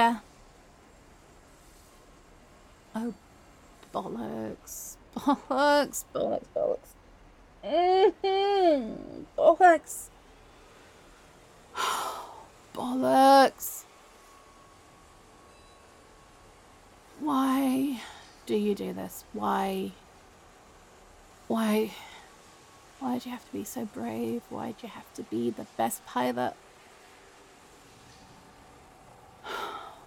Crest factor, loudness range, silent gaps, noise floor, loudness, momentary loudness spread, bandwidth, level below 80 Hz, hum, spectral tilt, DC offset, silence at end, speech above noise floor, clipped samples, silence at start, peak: 24 dB; 15 LU; none; -55 dBFS; -28 LUFS; 20 LU; 17.5 kHz; -62 dBFS; none; -4 dB/octave; under 0.1%; 0.05 s; 28 dB; under 0.1%; 0 s; -8 dBFS